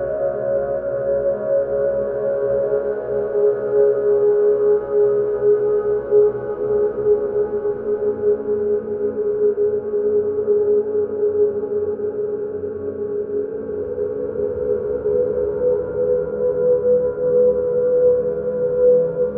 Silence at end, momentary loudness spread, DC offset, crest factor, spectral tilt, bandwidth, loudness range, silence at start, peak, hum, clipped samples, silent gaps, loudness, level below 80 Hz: 0 s; 7 LU; under 0.1%; 14 dB; -12 dB/octave; 2.1 kHz; 5 LU; 0 s; -6 dBFS; none; under 0.1%; none; -19 LUFS; -50 dBFS